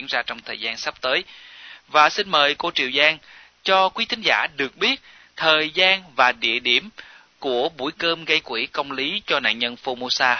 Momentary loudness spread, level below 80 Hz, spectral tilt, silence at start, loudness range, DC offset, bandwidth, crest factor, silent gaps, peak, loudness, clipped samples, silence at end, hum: 11 LU; -64 dBFS; -2 dB/octave; 0 s; 3 LU; under 0.1%; 6.6 kHz; 20 dB; none; -2 dBFS; -20 LUFS; under 0.1%; 0 s; none